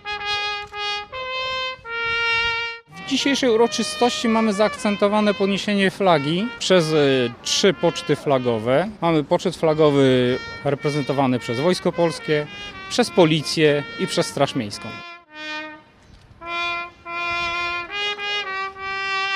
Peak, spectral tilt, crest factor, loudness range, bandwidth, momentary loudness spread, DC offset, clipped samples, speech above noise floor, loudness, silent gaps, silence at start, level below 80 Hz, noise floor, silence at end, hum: -2 dBFS; -4.5 dB/octave; 20 dB; 7 LU; 15 kHz; 11 LU; under 0.1%; under 0.1%; 29 dB; -21 LUFS; none; 0.05 s; -54 dBFS; -49 dBFS; 0 s; none